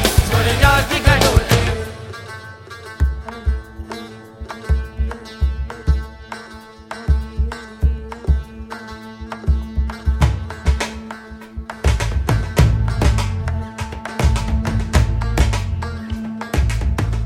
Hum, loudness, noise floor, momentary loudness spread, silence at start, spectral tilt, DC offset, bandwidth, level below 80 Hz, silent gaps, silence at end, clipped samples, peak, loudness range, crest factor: none; -19 LUFS; -38 dBFS; 18 LU; 0 s; -5 dB/octave; under 0.1%; 17 kHz; -22 dBFS; none; 0 s; under 0.1%; 0 dBFS; 7 LU; 18 dB